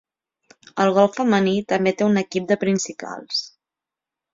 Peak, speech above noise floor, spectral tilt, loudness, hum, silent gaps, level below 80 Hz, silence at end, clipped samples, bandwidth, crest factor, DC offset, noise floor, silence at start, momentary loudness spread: -4 dBFS; 68 dB; -5 dB/octave; -20 LUFS; none; none; -64 dBFS; 0.85 s; under 0.1%; 7.6 kHz; 18 dB; under 0.1%; -88 dBFS; 0.75 s; 12 LU